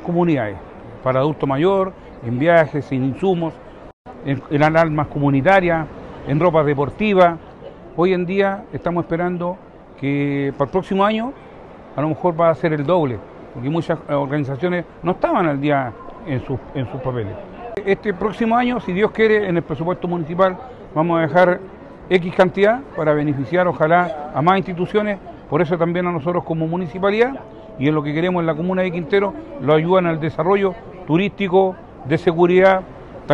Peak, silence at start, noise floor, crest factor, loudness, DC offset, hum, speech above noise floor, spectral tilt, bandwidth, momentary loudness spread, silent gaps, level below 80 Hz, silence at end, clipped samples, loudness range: -2 dBFS; 0 s; -39 dBFS; 16 dB; -19 LUFS; under 0.1%; none; 21 dB; -8.5 dB/octave; 8.4 kHz; 13 LU; 3.93-4.05 s; -46 dBFS; 0 s; under 0.1%; 4 LU